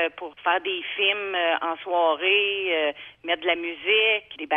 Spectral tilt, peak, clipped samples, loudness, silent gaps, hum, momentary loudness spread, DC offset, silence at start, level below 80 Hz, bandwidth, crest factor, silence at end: -4.5 dB/octave; -8 dBFS; under 0.1%; -23 LUFS; none; none; 8 LU; under 0.1%; 0 s; -70 dBFS; 3.9 kHz; 16 dB; 0 s